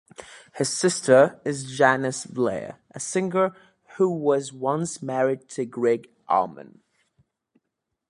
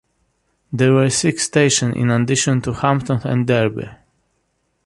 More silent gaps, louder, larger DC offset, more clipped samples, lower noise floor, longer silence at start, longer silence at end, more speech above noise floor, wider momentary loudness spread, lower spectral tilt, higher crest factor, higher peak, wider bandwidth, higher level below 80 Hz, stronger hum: neither; second, -24 LUFS vs -17 LUFS; neither; neither; first, -81 dBFS vs -68 dBFS; second, 0.2 s vs 0.7 s; first, 1.45 s vs 0.9 s; first, 58 dB vs 51 dB; first, 14 LU vs 7 LU; about the same, -4.5 dB/octave vs -5 dB/octave; first, 22 dB vs 16 dB; about the same, -2 dBFS vs -2 dBFS; about the same, 11.5 kHz vs 11.5 kHz; second, -68 dBFS vs -48 dBFS; neither